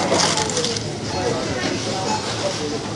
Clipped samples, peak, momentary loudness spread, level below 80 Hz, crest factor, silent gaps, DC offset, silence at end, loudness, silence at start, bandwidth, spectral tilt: under 0.1%; -2 dBFS; 7 LU; -48 dBFS; 20 dB; none; under 0.1%; 0 s; -21 LUFS; 0 s; 11.5 kHz; -3 dB/octave